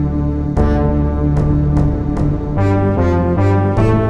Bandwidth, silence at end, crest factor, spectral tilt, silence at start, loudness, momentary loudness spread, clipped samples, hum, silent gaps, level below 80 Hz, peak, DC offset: 7.6 kHz; 0 s; 12 dB; -10 dB/octave; 0 s; -15 LUFS; 4 LU; under 0.1%; none; none; -20 dBFS; -2 dBFS; 0.9%